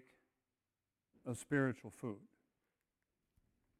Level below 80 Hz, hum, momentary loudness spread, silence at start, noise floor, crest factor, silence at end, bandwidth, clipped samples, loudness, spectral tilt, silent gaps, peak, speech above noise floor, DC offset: -78 dBFS; none; 15 LU; 1.25 s; under -90 dBFS; 24 dB; 1.55 s; 15.5 kHz; under 0.1%; -41 LUFS; -6.5 dB/octave; none; -22 dBFS; over 49 dB; under 0.1%